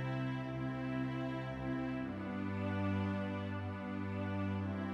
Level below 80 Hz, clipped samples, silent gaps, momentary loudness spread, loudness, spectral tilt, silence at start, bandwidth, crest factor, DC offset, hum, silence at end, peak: -62 dBFS; under 0.1%; none; 4 LU; -40 LUFS; -8.5 dB/octave; 0 s; 7 kHz; 12 dB; under 0.1%; none; 0 s; -26 dBFS